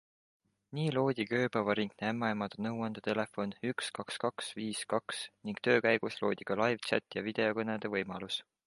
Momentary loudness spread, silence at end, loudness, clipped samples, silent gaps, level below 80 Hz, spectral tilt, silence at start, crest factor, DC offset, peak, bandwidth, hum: 7 LU; 0.25 s; -34 LUFS; under 0.1%; none; -74 dBFS; -5 dB/octave; 0.7 s; 20 dB; under 0.1%; -14 dBFS; 11.5 kHz; none